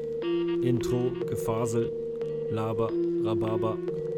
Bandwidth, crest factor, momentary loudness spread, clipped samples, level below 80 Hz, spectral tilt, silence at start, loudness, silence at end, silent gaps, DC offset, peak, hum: 15 kHz; 14 dB; 5 LU; under 0.1%; -54 dBFS; -7.5 dB/octave; 0 s; -29 LUFS; 0 s; none; under 0.1%; -14 dBFS; none